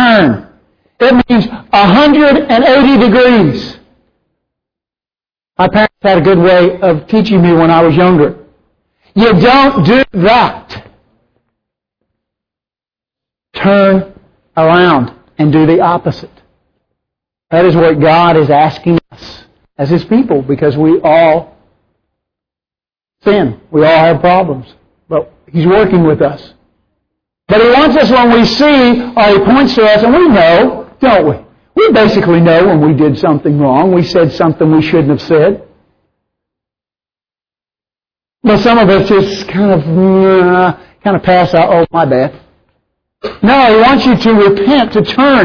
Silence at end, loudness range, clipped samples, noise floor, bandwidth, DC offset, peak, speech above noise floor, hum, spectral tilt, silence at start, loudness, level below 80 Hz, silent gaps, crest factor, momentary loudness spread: 0 s; 6 LU; 0.2%; under -90 dBFS; 5.4 kHz; under 0.1%; 0 dBFS; over 83 dB; none; -7.5 dB/octave; 0 s; -8 LUFS; -38 dBFS; none; 8 dB; 9 LU